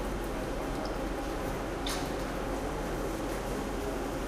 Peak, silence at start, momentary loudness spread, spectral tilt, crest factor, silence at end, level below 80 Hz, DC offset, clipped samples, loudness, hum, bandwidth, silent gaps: -20 dBFS; 0 s; 1 LU; -5 dB/octave; 14 dB; 0 s; -40 dBFS; under 0.1%; under 0.1%; -35 LUFS; none; 16 kHz; none